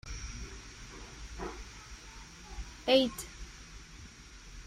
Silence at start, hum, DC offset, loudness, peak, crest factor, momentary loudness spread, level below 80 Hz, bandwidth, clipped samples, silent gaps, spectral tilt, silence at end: 0.05 s; none; under 0.1%; -34 LUFS; -12 dBFS; 26 dB; 23 LU; -48 dBFS; 15.5 kHz; under 0.1%; none; -3.5 dB/octave; 0 s